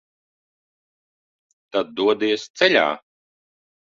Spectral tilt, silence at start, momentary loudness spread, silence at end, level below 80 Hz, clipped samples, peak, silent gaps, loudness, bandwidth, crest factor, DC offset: -3.5 dB/octave; 1.75 s; 10 LU; 1 s; -68 dBFS; under 0.1%; -2 dBFS; 2.50-2.54 s; -20 LUFS; 7.6 kHz; 22 dB; under 0.1%